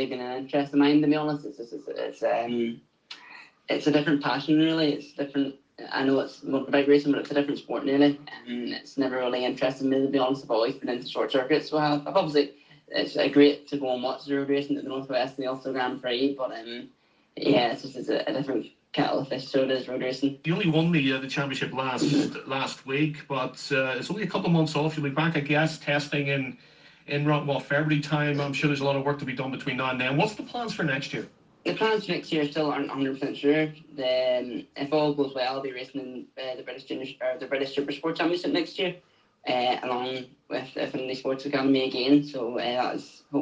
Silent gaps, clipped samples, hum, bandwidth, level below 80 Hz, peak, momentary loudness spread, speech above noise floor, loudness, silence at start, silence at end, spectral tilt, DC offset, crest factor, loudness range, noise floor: none; under 0.1%; none; 9.2 kHz; -70 dBFS; -6 dBFS; 12 LU; 23 dB; -27 LUFS; 0 s; 0 s; -6 dB/octave; under 0.1%; 20 dB; 4 LU; -49 dBFS